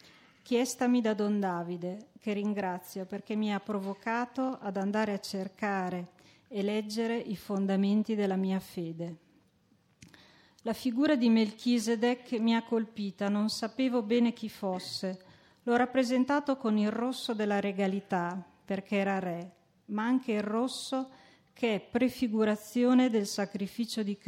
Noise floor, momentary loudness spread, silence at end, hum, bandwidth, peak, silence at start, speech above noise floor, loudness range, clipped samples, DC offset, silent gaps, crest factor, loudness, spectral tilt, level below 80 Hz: -68 dBFS; 10 LU; 0.1 s; none; 16 kHz; -16 dBFS; 0.45 s; 38 dB; 4 LU; under 0.1%; under 0.1%; none; 16 dB; -31 LUFS; -5.5 dB/octave; -74 dBFS